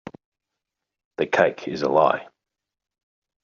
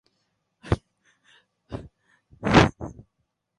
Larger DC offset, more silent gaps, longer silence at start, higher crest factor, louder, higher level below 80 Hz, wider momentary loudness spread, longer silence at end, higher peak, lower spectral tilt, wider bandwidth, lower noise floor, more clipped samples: neither; neither; first, 1.2 s vs 0.65 s; about the same, 22 dB vs 26 dB; about the same, -22 LUFS vs -22 LUFS; second, -66 dBFS vs -42 dBFS; second, 10 LU vs 22 LU; first, 1.2 s vs 0.65 s; about the same, -2 dBFS vs -2 dBFS; second, -3.5 dB/octave vs -6 dB/octave; second, 7.2 kHz vs 11.5 kHz; first, -85 dBFS vs -77 dBFS; neither